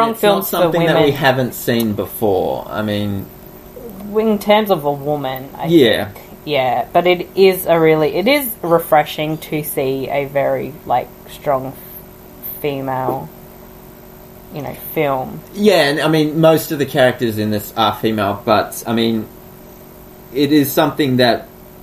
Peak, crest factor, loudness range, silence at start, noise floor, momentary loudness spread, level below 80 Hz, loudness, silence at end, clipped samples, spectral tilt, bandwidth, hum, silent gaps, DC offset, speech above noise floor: 0 dBFS; 16 dB; 8 LU; 0 s; -38 dBFS; 15 LU; -46 dBFS; -16 LUFS; 0.05 s; under 0.1%; -5.5 dB/octave; 15.5 kHz; none; none; under 0.1%; 23 dB